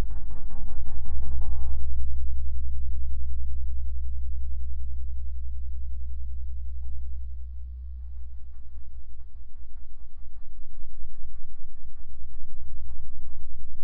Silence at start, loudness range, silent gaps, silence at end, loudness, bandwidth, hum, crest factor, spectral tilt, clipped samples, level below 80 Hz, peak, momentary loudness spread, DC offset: 0 s; 13 LU; none; 0 s; -38 LUFS; 1 kHz; none; 10 dB; -11 dB/octave; under 0.1%; -32 dBFS; -8 dBFS; 15 LU; under 0.1%